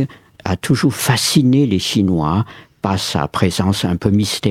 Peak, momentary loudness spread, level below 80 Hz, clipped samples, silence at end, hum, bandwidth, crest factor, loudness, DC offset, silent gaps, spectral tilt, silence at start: 0 dBFS; 10 LU; -42 dBFS; under 0.1%; 0 s; none; 16.5 kHz; 16 dB; -16 LUFS; under 0.1%; none; -5 dB/octave; 0 s